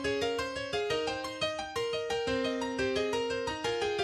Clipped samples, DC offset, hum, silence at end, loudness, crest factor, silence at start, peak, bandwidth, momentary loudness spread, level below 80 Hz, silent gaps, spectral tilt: under 0.1%; under 0.1%; none; 0 s; -32 LUFS; 14 dB; 0 s; -18 dBFS; 13 kHz; 3 LU; -56 dBFS; none; -3.5 dB/octave